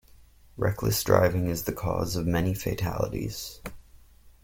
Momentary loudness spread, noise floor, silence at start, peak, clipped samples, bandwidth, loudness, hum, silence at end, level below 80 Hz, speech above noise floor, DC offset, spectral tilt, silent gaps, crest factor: 14 LU; -54 dBFS; 0.55 s; -6 dBFS; under 0.1%; 17 kHz; -27 LUFS; none; 0.15 s; -44 dBFS; 27 dB; under 0.1%; -5.5 dB/octave; none; 22 dB